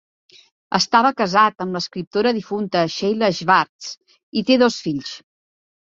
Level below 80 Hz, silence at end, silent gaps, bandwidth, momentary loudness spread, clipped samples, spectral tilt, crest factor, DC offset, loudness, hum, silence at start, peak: -62 dBFS; 0.7 s; 2.07-2.11 s, 3.69-3.79 s, 3.97-4.01 s, 4.23-4.32 s; 7.8 kHz; 14 LU; under 0.1%; -4.5 dB/octave; 18 dB; under 0.1%; -19 LUFS; none; 0.7 s; -2 dBFS